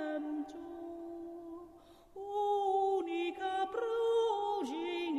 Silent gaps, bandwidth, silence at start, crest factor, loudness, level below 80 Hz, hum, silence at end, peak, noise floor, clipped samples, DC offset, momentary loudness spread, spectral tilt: none; 12.5 kHz; 0 s; 12 dB; -36 LUFS; -72 dBFS; none; 0 s; -22 dBFS; -58 dBFS; under 0.1%; under 0.1%; 17 LU; -4 dB/octave